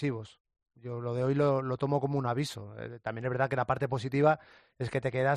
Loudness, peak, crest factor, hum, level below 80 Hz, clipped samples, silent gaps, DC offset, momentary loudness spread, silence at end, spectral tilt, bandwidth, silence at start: -31 LUFS; -12 dBFS; 20 dB; none; -64 dBFS; under 0.1%; 0.40-0.45 s; under 0.1%; 14 LU; 0 s; -7 dB/octave; 11.5 kHz; 0 s